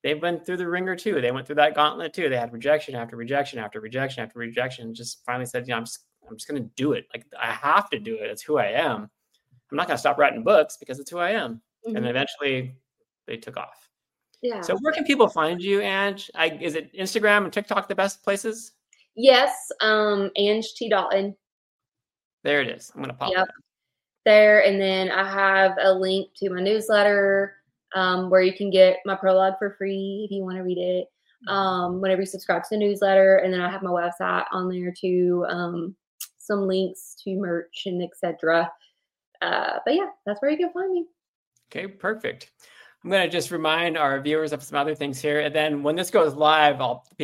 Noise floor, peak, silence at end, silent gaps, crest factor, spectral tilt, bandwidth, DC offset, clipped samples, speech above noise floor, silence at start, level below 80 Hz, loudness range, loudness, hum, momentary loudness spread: -85 dBFS; -2 dBFS; 0 s; 21.52-21.79 s, 22.25-22.38 s, 36.07-36.18 s, 39.27-39.32 s, 41.28-41.52 s; 22 dB; -4.5 dB/octave; 16 kHz; under 0.1%; under 0.1%; 62 dB; 0.05 s; -72 dBFS; 8 LU; -23 LUFS; none; 15 LU